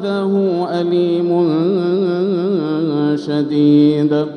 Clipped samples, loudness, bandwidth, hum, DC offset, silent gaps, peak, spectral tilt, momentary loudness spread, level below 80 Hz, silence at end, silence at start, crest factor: under 0.1%; -15 LUFS; 6.2 kHz; none; under 0.1%; none; -2 dBFS; -9 dB/octave; 6 LU; -66 dBFS; 0 s; 0 s; 12 dB